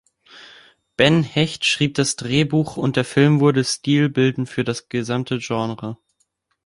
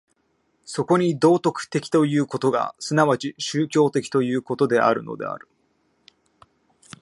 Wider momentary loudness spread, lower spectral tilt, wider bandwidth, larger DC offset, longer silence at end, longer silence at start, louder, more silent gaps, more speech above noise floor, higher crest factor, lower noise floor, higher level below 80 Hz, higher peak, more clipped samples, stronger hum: about the same, 9 LU vs 11 LU; about the same, -5 dB/octave vs -6 dB/octave; about the same, 11.5 kHz vs 11.5 kHz; neither; second, 0.7 s vs 1.65 s; second, 0.35 s vs 0.7 s; first, -19 LUFS vs -22 LUFS; neither; about the same, 50 dB vs 47 dB; about the same, 18 dB vs 20 dB; about the same, -69 dBFS vs -68 dBFS; first, -54 dBFS vs -70 dBFS; about the same, -2 dBFS vs -2 dBFS; neither; neither